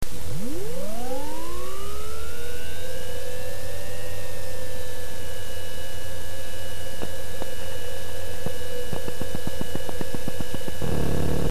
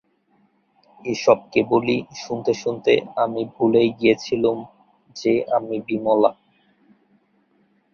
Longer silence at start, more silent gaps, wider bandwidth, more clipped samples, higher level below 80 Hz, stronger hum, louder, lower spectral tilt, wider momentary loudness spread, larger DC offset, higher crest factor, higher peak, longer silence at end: second, 0 s vs 1.05 s; neither; first, 14 kHz vs 7 kHz; neither; first, -40 dBFS vs -60 dBFS; neither; second, -34 LUFS vs -21 LUFS; about the same, -4.5 dB/octave vs -5.5 dB/octave; second, 5 LU vs 8 LU; first, 20% vs under 0.1%; about the same, 20 dB vs 20 dB; second, -8 dBFS vs -2 dBFS; second, 0 s vs 1.6 s